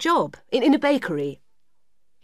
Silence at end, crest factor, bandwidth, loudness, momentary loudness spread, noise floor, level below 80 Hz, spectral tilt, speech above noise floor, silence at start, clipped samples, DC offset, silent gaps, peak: 0.9 s; 16 dB; 14.5 kHz; -22 LUFS; 10 LU; -79 dBFS; -68 dBFS; -5 dB/octave; 57 dB; 0 s; under 0.1%; 0.2%; none; -8 dBFS